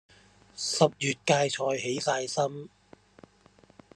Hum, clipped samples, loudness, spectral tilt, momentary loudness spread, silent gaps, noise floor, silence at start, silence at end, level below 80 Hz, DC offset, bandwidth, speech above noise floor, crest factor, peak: none; under 0.1%; -28 LUFS; -3.5 dB/octave; 15 LU; none; -60 dBFS; 0.55 s; 1.3 s; -70 dBFS; under 0.1%; 12.5 kHz; 32 dB; 24 dB; -8 dBFS